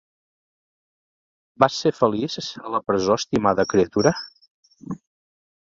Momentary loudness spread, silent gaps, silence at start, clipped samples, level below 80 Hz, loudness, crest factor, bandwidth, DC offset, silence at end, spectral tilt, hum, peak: 17 LU; 4.51-4.63 s; 1.6 s; under 0.1%; -54 dBFS; -21 LUFS; 22 dB; 7.8 kHz; under 0.1%; 0.65 s; -5 dB/octave; none; -2 dBFS